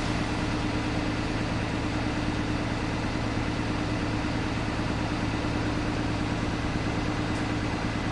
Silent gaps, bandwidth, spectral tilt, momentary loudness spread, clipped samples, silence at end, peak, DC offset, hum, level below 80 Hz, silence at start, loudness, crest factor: none; 11.5 kHz; -6 dB/octave; 1 LU; under 0.1%; 0 s; -14 dBFS; under 0.1%; none; -38 dBFS; 0 s; -29 LUFS; 14 dB